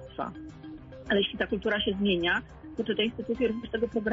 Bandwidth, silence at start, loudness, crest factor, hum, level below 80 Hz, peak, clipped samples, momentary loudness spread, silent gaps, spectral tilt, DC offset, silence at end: 7.6 kHz; 0 s; -29 LUFS; 16 dB; none; -52 dBFS; -14 dBFS; under 0.1%; 17 LU; none; -6.5 dB/octave; under 0.1%; 0 s